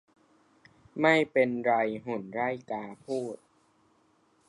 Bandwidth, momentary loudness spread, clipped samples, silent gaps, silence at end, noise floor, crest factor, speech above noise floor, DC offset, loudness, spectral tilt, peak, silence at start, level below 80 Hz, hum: 11.5 kHz; 15 LU; under 0.1%; none; 1.15 s; -67 dBFS; 22 dB; 39 dB; under 0.1%; -29 LUFS; -6 dB/octave; -10 dBFS; 0.95 s; -74 dBFS; none